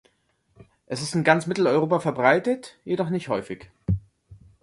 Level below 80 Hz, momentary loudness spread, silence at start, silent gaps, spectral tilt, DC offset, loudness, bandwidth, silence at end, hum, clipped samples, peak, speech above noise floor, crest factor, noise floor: -48 dBFS; 11 LU; 0.9 s; none; -6 dB/octave; under 0.1%; -24 LUFS; 11.5 kHz; 0.3 s; none; under 0.1%; -4 dBFS; 45 dB; 22 dB; -68 dBFS